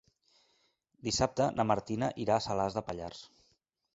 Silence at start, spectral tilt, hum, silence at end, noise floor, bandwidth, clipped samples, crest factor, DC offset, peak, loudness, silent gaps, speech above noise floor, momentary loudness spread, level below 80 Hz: 1.05 s; -5 dB/octave; none; 0.7 s; -75 dBFS; 8 kHz; under 0.1%; 22 dB; under 0.1%; -12 dBFS; -32 LUFS; none; 43 dB; 12 LU; -58 dBFS